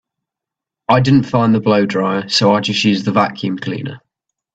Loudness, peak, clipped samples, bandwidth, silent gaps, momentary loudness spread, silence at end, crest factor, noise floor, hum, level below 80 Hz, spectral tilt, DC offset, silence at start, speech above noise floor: -15 LUFS; 0 dBFS; under 0.1%; 8.6 kHz; none; 11 LU; 0.55 s; 16 dB; -85 dBFS; none; -54 dBFS; -6 dB/octave; under 0.1%; 0.9 s; 70 dB